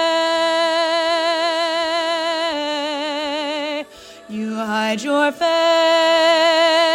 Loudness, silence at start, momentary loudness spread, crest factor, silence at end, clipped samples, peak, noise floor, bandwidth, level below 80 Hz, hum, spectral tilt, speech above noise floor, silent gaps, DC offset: -18 LUFS; 0 s; 10 LU; 14 dB; 0 s; under 0.1%; -4 dBFS; -39 dBFS; 15.5 kHz; -64 dBFS; none; -2.5 dB/octave; 24 dB; none; under 0.1%